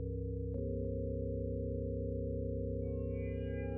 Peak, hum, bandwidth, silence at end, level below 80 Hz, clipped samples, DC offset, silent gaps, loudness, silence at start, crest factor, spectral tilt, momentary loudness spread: -26 dBFS; none; 3 kHz; 0 s; -44 dBFS; under 0.1%; under 0.1%; none; -39 LUFS; 0 s; 12 dB; -11 dB/octave; 1 LU